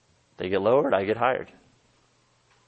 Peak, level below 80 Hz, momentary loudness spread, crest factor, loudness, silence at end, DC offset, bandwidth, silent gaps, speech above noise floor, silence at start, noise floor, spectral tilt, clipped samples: -8 dBFS; -66 dBFS; 13 LU; 20 dB; -24 LUFS; 1.25 s; under 0.1%; 8 kHz; none; 41 dB; 0.4 s; -65 dBFS; -7.5 dB/octave; under 0.1%